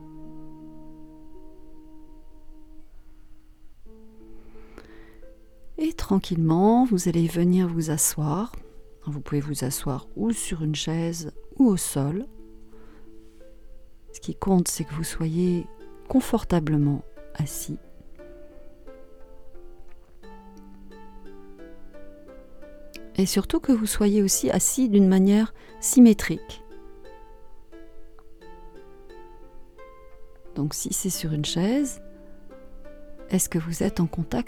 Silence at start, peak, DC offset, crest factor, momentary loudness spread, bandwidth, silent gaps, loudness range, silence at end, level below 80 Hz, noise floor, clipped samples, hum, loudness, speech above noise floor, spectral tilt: 0 s; -6 dBFS; under 0.1%; 22 dB; 21 LU; 19 kHz; none; 12 LU; 0 s; -44 dBFS; -45 dBFS; under 0.1%; none; -24 LUFS; 22 dB; -5.5 dB/octave